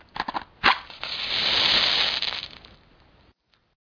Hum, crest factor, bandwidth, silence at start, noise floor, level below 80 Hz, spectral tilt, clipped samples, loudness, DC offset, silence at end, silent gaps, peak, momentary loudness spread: none; 22 dB; 5.4 kHz; 0.15 s; -63 dBFS; -54 dBFS; -1.5 dB/octave; under 0.1%; -22 LUFS; under 0.1%; 1.3 s; none; -4 dBFS; 14 LU